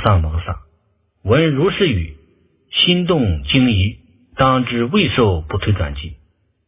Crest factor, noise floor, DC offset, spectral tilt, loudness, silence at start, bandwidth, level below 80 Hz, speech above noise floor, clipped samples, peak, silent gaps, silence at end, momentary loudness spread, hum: 18 dB; -62 dBFS; under 0.1%; -10.5 dB/octave; -16 LUFS; 0 s; 4 kHz; -30 dBFS; 46 dB; under 0.1%; 0 dBFS; none; 0.5 s; 16 LU; none